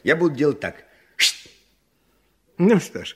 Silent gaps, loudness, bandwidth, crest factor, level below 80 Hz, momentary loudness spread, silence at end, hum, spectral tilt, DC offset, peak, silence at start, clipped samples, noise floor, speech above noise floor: none; -20 LUFS; 16 kHz; 20 dB; -62 dBFS; 16 LU; 0.05 s; none; -4 dB/octave; under 0.1%; -4 dBFS; 0.05 s; under 0.1%; -65 dBFS; 45 dB